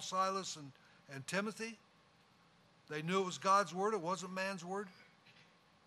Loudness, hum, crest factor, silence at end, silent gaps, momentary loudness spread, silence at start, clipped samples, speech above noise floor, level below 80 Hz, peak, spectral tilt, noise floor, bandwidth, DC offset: -38 LUFS; none; 22 dB; 0.45 s; none; 17 LU; 0 s; under 0.1%; 30 dB; -86 dBFS; -18 dBFS; -4 dB/octave; -68 dBFS; 14.5 kHz; under 0.1%